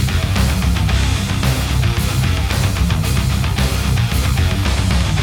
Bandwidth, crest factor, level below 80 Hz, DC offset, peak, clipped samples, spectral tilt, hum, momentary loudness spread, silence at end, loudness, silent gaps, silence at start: 20 kHz; 12 dB; -20 dBFS; under 0.1%; -4 dBFS; under 0.1%; -5 dB/octave; none; 1 LU; 0 s; -17 LUFS; none; 0 s